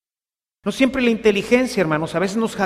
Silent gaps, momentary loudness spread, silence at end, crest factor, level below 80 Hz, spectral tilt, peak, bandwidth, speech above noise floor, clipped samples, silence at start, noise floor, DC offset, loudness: none; 6 LU; 0 s; 18 dB; -50 dBFS; -5 dB/octave; -2 dBFS; 15 kHz; over 72 dB; under 0.1%; 0.65 s; under -90 dBFS; under 0.1%; -19 LUFS